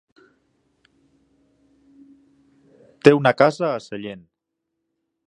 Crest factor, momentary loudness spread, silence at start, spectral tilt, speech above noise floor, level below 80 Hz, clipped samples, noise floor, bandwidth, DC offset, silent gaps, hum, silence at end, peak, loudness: 24 dB; 20 LU; 3.05 s; -6.5 dB/octave; 62 dB; -66 dBFS; under 0.1%; -80 dBFS; 10.5 kHz; under 0.1%; none; none; 1.1 s; 0 dBFS; -18 LUFS